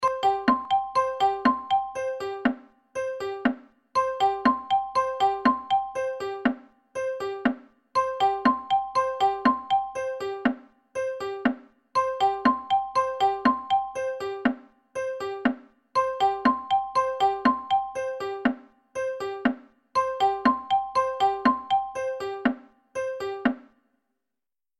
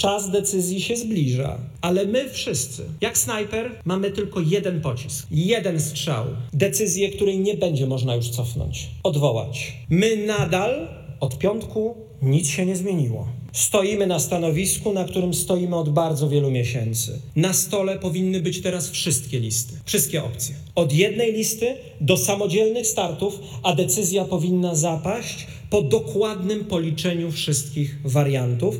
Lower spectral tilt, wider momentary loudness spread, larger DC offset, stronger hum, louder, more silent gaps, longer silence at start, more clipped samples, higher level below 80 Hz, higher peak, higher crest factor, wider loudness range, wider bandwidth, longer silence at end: about the same, -4.5 dB/octave vs -4.5 dB/octave; first, 10 LU vs 7 LU; neither; neither; second, -26 LUFS vs -22 LUFS; neither; about the same, 0 s vs 0 s; neither; second, -60 dBFS vs -48 dBFS; second, -8 dBFS vs -2 dBFS; about the same, 18 dB vs 20 dB; about the same, 2 LU vs 2 LU; second, 13.5 kHz vs 18.5 kHz; first, 1.2 s vs 0 s